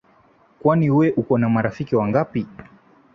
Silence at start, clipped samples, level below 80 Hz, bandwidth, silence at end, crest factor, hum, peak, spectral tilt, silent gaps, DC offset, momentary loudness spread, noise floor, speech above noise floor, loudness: 0.65 s; under 0.1%; -54 dBFS; 6.6 kHz; 0.5 s; 16 dB; none; -4 dBFS; -10 dB/octave; none; under 0.1%; 9 LU; -56 dBFS; 37 dB; -20 LUFS